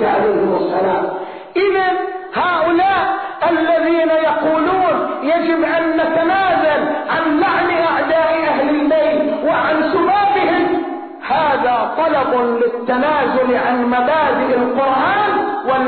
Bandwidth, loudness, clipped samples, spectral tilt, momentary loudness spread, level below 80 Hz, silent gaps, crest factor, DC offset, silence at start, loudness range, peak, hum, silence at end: 4.6 kHz; -15 LUFS; under 0.1%; -2.5 dB/octave; 4 LU; -52 dBFS; none; 10 dB; 0.2%; 0 s; 1 LU; -6 dBFS; none; 0 s